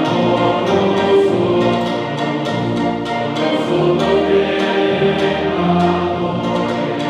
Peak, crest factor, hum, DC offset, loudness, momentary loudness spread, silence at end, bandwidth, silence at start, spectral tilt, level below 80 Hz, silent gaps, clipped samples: -2 dBFS; 12 dB; none; under 0.1%; -16 LUFS; 5 LU; 0 s; 10.5 kHz; 0 s; -6.5 dB/octave; -46 dBFS; none; under 0.1%